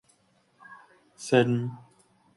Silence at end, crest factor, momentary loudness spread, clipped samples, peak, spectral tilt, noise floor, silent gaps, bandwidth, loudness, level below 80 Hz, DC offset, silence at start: 0.6 s; 22 dB; 26 LU; under 0.1%; -8 dBFS; -6 dB/octave; -66 dBFS; none; 11.5 kHz; -26 LUFS; -70 dBFS; under 0.1%; 0.7 s